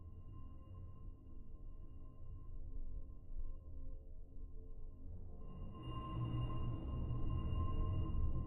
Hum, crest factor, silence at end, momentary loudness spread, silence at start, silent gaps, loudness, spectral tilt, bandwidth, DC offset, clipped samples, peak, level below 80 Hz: none; 14 dB; 0 s; 16 LU; 0 s; none; -48 LUFS; -10 dB/octave; 3 kHz; under 0.1%; under 0.1%; -28 dBFS; -46 dBFS